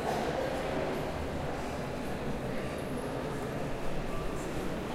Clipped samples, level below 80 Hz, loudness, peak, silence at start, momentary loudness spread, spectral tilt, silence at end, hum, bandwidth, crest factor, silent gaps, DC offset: under 0.1%; -44 dBFS; -36 LUFS; -20 dBFS; 0 s; 4 LU; -6 dB/octave; 0 s; none; 16 kHz; 14 dB; none; under 0.1%